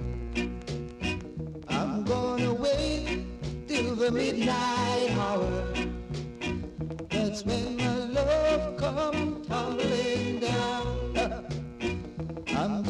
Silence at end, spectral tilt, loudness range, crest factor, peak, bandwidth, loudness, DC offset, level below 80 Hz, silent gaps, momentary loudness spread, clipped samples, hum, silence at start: 0 s; -5.5 dB/octave; 2 LU; 14 dB; -14 dBFS; 11.5 kHz; -30 LUFS; under 0.1%; -42 dBFS; none; 9 LU; under 0.1%; none; 0 s